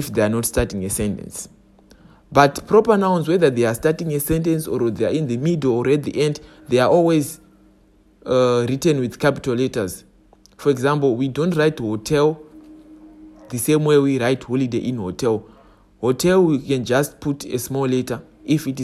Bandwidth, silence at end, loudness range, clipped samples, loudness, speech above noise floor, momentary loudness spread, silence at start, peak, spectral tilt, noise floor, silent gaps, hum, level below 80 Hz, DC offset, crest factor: 16 kHz; 0 s; 3 LU; under 0.1%; -19 LUFS; 35 dB; 10 LU; 0 s; 0 dBFS; -6 dB/octave; -54 dBFS; none; none; -44 dBFS; under 0.1%; 20 dB